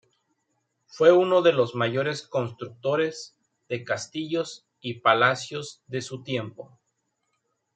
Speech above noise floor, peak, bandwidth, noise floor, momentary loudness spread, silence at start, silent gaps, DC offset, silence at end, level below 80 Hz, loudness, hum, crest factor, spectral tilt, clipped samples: 52 dB; -4 dBFS; 9.2 kHz; -76 dBFS; 17 LU; 0.95 s; none; under 0.1%; 1.1 s; -74 dBFS; -25 LUFS; none; 24 dB; -5 dB/octave; under 0.1%